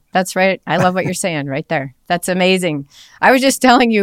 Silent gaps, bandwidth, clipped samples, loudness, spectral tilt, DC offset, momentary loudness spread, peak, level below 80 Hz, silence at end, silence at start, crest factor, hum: none; 16.5 kHz; under 0.1%; -15 LUFS; -4.5 dB/octave; under 0.1%; 10 LU; 0 dBFS; -52 dBFS; 0 s; 0.15 s; 14 dB; none